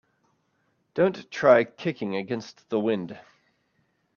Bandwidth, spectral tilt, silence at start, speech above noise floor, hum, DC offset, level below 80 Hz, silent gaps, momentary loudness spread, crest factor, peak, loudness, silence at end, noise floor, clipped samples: 7 kHz; -6.5 dB/octave; 0.95 s; 47 dB; none; under 0.1%; -72 dBFS; none; 15 LU; 22 dB; -4 dBFS; -25 LUFS; 0.95 s; -71 dBFS; under 0.1%